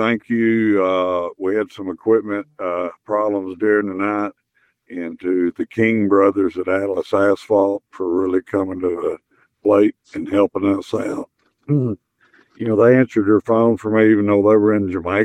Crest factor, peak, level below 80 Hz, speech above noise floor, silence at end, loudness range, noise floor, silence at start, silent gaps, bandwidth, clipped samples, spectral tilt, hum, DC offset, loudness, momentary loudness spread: 16 dB; -2 dBFS; -60 dBFS; 46 dB; 0 s; 5 LU; -64 dBFS; 0 s; none; 9.2 kHz; under 0.1%; -8 dB/octave; none; under 0.1%; -18 LUFS; 12 LU